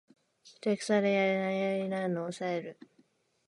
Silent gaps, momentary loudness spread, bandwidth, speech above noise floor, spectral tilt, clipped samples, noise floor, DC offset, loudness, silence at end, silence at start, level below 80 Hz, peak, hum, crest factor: none; 9 LU; 11.5 kHz; 38 dB; -6 dB/octave; under 0.1%; -69 dBFS; under 0.1%; -31 LUFS; 0.75 s; 0.45 s; -80 dBFS; -14 dBFS; none; 18 dB